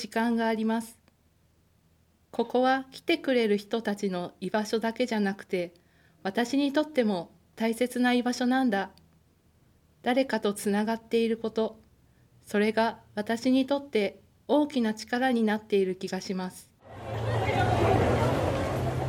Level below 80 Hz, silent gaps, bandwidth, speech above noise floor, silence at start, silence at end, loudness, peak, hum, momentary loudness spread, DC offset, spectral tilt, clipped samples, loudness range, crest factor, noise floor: -52 dBFS; none; 16.5 kHz; 38 dB; 0 s; 0 s; -28 LUFS; -12 dBFS; none; 9 LU; under 0.1%; -6 dB/octave; under 0.1%; 2 LU; 16 dB; -65 dBFS